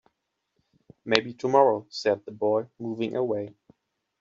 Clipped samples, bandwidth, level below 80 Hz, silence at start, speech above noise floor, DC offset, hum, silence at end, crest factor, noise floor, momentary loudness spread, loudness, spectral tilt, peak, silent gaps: under 0.1%; 7.6 kHz; -70 dBFS; 1.05 s; 54 dB; under 0.1%; none; 0.7 s; 24 dB; -79 dBFS; 12 LU; -26 LUFS; -3 dB/octave; -4 dBFS; none